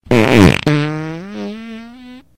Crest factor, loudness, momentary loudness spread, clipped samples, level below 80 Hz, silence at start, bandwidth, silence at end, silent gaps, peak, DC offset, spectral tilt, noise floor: 14 dB; -12 LUFS; 21 LU; 0.2%; -36 dBFS; 0.05 s; 16.5 kHz; 0.15 s; none; 0 dBFS; under 0.1%; -6.5 dB/octave; -37 dBFS